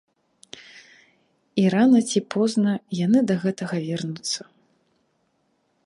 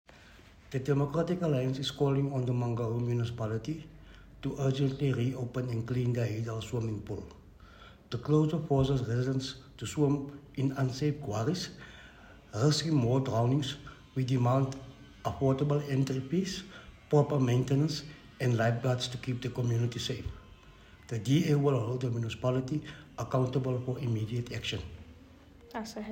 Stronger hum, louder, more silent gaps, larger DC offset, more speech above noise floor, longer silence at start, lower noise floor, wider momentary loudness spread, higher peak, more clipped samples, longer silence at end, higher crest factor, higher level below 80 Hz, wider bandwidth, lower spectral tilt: neither; first, -22 LUFS vs -32 LUFS; neither; neither; first, 48 dB vs 25 dB; first, 0.55 s vs 0.15 s; first, -69 dBFS vs -55 dBFS; first, 19 LU vs 14 LU; first, -8 dBFS vs -12 dBFS; neither; first, 1.45 s vs 0 s; about the same, 16 dB vs 20 dB; second, -70 dBFS vs -56 dBFS; second, 11.5 kHz vs 16 kHz; about the same, -5.5 dB/octave vs -6.5 dB/octave